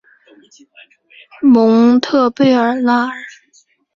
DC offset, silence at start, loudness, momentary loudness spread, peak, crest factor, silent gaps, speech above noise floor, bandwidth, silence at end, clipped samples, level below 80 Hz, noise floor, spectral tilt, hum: under 0.1%; 1.4 s; -12 LUFS; 12 LU; 0 dBFS; 14 dB; none; 42 dB; 7.2 kHz; 0.65 s; under 0.1%; -60 dBFS; -54 dBFS; -6 dB/octave; none